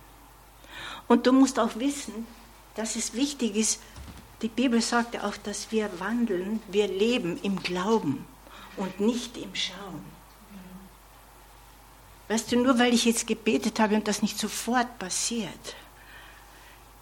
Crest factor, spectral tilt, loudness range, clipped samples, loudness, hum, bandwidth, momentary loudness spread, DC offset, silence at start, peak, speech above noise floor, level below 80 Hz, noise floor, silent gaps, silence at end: 20 dB; -3.5 dB/octave; 9 LU; under 0.1%; -27 LUFS; none; 17.5 kHz; 23 LU; under 0.1%; 0 s; -8 dBFS; 25 dB; -56 dBFS; -52 dBFS; none; 0.25 s